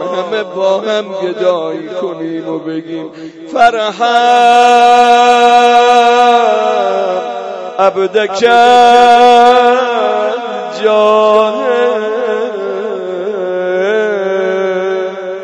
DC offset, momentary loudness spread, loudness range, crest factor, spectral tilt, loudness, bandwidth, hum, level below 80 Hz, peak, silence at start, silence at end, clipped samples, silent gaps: under 0.1%; 14 LU; 8 LU; 10 dB; -3.5 dB/octave; -10 LUFS; 11 kHz; none; -56 dBFS; 0 dBFS; 0 s; 0 s; 1%; none